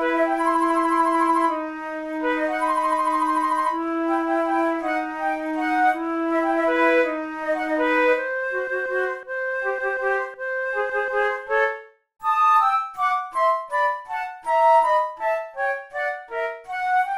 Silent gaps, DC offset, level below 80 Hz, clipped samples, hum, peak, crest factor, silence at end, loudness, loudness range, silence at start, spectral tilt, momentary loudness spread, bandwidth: none; under 0.1%; -60 dBFS; under 0.1%; none; -8 dBFS; 14 dB; 0 s; -22 LUFS; 3 LU; 0 s; -3.5 dB/octave; 9 LU; 13.5 kHz